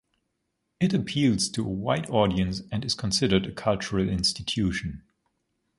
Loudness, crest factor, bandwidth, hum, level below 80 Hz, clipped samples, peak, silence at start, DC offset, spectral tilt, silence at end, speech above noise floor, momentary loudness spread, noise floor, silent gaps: -26 LUFS; 20 dB; 11.5 kHz; none; -46 dBFS; under 0.1%; -6 dBFS; 0.8 s; under 0.1%; -5 dB/octave; 0.8 s; 52 dB; 6 LU; -78 dBFS; none